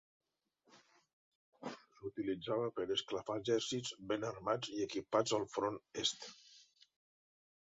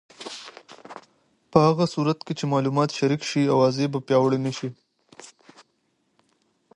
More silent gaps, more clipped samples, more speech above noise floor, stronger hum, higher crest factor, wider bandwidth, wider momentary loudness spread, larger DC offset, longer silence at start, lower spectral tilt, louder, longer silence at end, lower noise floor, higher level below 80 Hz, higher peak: first, 1.13-1.52 s vs none; neither; second, 39 dB vs 49 dB; neither; about the same, 22 dB vs 22 dB; second, 7.6 kHz vs 11 kHz; second, 14 LU vs 22 LU; neither; first, 0.75 s vs 0.2 s; second, -3 dB/octave vs -6.5 dB/octave; second, -39 LUFS vs -23 LUFS; second, 1.15 s vs 1.5 s; first, -77 dBFS vs -70 dBFS; second, -76 dBFS vs -64 dBFS; second, -20 dBFS vs -2 dBFS